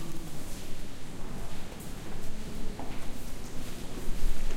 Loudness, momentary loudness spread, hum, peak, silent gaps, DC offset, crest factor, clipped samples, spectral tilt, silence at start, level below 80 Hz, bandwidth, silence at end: -42 LUFS; 5 LU; none; -12 dBFS; none; under 0.1%; 14 dB; under 0.1%; -4.5 dB/octave; 0 s; -34 dBFS; 14.5 kHz; 0 s